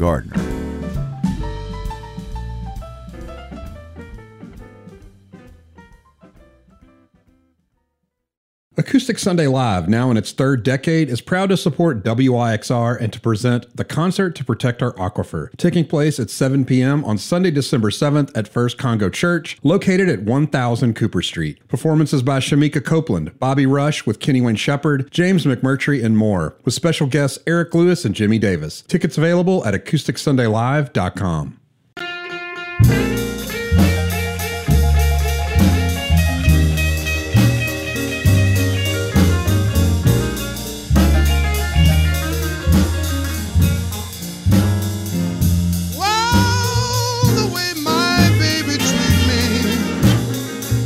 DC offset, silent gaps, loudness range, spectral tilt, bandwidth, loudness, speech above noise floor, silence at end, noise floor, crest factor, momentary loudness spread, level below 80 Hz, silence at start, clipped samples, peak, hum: under 0.1%; 8.37-8.71 s; 5 LU; -5.5 dB/octave; 16 kHz; -18 LUFS; 57 dB; 0 s; -74 dBFS; 16 dB; 10 LU; -28 dBFS; 0 s; under 0.1%; -2 dBFS; none